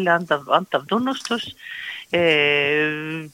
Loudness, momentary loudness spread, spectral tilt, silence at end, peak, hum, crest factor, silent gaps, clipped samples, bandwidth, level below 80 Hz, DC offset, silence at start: -20 LUFS; 14 LU; -4.5 dB/octave; 0.05 s; -2 dBFS; none; 20 dB; none; under 0.1%; 16.5 kHz; -66 dBFS; under 0.1%; 0 s